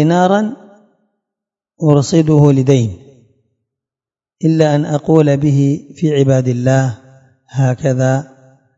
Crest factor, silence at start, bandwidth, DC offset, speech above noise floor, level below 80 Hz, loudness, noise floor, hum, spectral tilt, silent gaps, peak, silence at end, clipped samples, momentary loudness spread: 14 dB; 0 s; 7.8 kHz; under 0.1%; over 78 dB; -52 dBFS; -13 LUFS; under -90 dBFS; none; -7.5 dB/octave; none; 0 dBFS; 0.55 s; under 0.1%; 9 LU